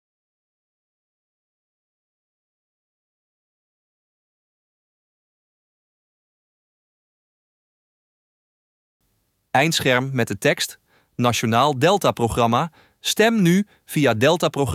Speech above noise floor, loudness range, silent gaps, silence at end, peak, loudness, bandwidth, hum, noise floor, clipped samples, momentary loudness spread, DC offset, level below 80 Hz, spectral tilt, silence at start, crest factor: 50 dB; 6 LU; none; 0 s; -4 dBFS; -19 LUFS; 16.5 kHz; none; -69 dBFS; under 0.1%; 7 LU; under 0.1%; -54 dBFS; -4.5 dB/octave; 9.55 s; 20 dB